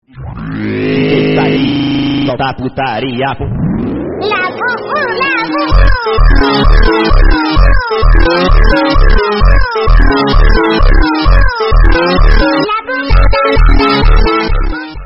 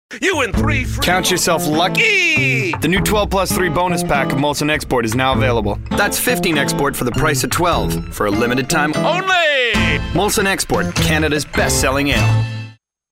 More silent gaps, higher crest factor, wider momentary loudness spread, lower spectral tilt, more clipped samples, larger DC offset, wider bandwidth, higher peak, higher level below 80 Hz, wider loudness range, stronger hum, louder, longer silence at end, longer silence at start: neither; second, 8 dB vs 14 dB; about the same, 6 LU vs 5 LU; first, -8 dB/octave vs -4 dB/octave; neither; neither; second, 5.8 kHz vs 16.5 kHz; about the same, 0 dBFS vs -2 dBFS; first, -10 dBFS vs -30 dBFS; about the same, 4 LU vs 2 LU; neither; first, -11 LUFS vs -15 LUFS; second, 0 s vs 0.4 s; about the same, 0 s vs 0.1 s